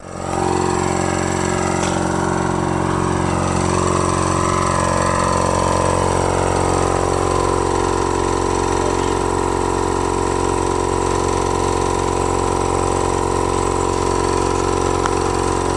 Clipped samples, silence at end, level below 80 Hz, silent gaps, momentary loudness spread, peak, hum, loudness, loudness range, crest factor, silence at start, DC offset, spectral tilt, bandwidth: under 0.1%; 0 s; -32 dBFS; none; 2 LU; 0 dBFS; none; -18 LUFS; 1 LU; 18 dB; 0 s; under 0.1%; -5 dB/octave; 11.5 kHz